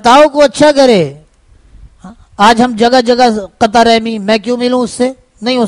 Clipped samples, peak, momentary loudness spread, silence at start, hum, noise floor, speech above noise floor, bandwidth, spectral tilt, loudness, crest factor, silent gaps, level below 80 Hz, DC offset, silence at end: 1%; 0 dBFS; 9 LU; 0.05 s; none; -44 dBFS; 36 dB; 11 kHz; -4.5 dB/octave; -9 LUFS; 10 dB; none; -40 dBFS; under 0.1%; 0 s